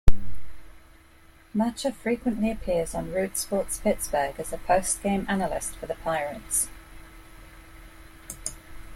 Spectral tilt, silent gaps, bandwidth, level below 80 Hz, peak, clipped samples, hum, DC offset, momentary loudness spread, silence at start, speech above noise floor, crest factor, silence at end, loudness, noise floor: -4.5 dB/octave; none; 16.5 kHz; -36 dBFS; -2 dBFS; under 0.1%; none; under 0.1%; 23 LU; 0.05 s; 26 dB; 22 dB; 0 s; -28 LUFS; -53 dBFS